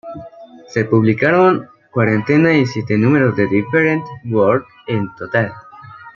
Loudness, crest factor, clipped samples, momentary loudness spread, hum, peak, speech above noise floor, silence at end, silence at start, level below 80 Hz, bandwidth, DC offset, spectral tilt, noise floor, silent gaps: -16 LUFS; 14 dB; under 0.1%; 10 LU; none; -2 dBFS; 23 dB; 0.05 s; 0.05 s; -54 dBFS; 7.2 kHz; under 0.1%; -8 dB/octave; -38 dBFS; none